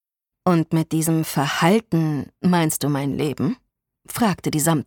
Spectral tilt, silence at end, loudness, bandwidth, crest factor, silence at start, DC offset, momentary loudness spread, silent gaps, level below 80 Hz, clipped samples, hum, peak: -5.5 dB/octave; 0.05 s; -21 LUFS; 19 kHz; 18 dB; 0.45 s; under 0.1%; 7 LU; none; -56 dBFS; under 0.1%; none; -4 dBFS